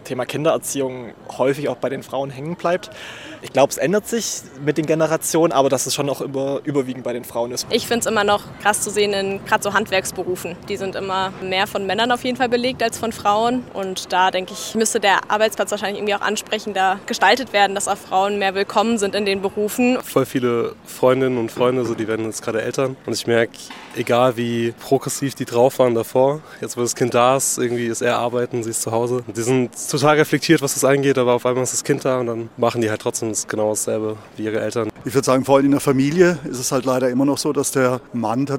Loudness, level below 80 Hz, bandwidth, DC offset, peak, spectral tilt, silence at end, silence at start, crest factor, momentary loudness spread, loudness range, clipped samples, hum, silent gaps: -19 LUFS; -58 dBFS; 17 kHz; under 0.1%; -2 dBFS; -4 dB/octave; 0 s; 0 s; 18 dB; 9 LU; 3 LU; under 0.1%; none; none